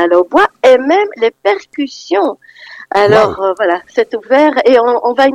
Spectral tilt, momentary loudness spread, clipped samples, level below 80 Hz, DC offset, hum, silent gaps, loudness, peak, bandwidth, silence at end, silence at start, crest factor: -5 dB/octave; 9 LU; under 0.1%; -52 dBFS; under 0.1%; none; none; -11 LUFS; 0 dBFS; 10.5 kHz; 0 s; 0 s; 12 dB